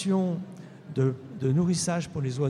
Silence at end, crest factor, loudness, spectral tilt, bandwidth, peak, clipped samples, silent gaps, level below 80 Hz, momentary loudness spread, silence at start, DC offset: 0 s; 14 dB; -28 LUFS; -6 dB/octave; 12.5 kHz; -14 dBFS; under 0.1%; none; -62 dBFS; 11 LU; 0 s; under 0.1%